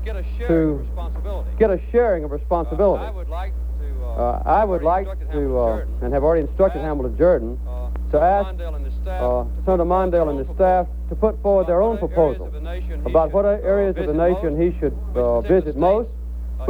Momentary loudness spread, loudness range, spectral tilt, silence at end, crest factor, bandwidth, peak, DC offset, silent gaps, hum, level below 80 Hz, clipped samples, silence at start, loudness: 11 LU; 2 LU; -9.5 dB/octave; 0 s; 16 dB; 4.6 kHz; -2 dBFS; under 0.1%; none; none; -26 dBFS; under 0.1%; 0 s; -21 LUFS